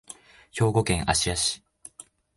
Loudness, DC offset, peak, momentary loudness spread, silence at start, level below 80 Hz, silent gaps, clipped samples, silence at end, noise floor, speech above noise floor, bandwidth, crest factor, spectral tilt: -24 LUFS; under 0.1%; -6 dBFS; 22 LU; 0.1 s; -42 dBFS; none; under 0.1%; 0.8 s; -51 dBFS; 27 dB; 11.5 kHz; 20 dB; -3.5 dB/octave